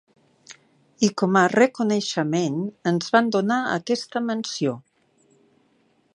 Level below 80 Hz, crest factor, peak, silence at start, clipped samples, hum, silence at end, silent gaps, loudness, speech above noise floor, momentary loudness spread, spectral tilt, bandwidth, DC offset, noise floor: -72 dBFS; 22 dB; -2 dBFS; 0.5 s; under 0.1%; none; 1.35 s; none; -22 LUFS; 42 dB; 8 LU; -5 dB/octave; 11 kHz; under 0.1%; -64 dBFS